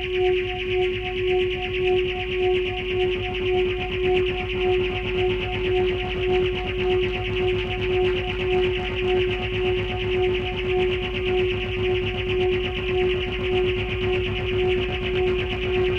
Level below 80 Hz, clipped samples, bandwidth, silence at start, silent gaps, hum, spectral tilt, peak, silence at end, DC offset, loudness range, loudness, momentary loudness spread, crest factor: -34 dBFS; under 0.1%; 6.4 kHz; 0 s; none; none; -7 dB/octave; -10 dBFS; 0 s; under 0.1%; 1 LU; -23 LUFS; 2 LU; 14 dB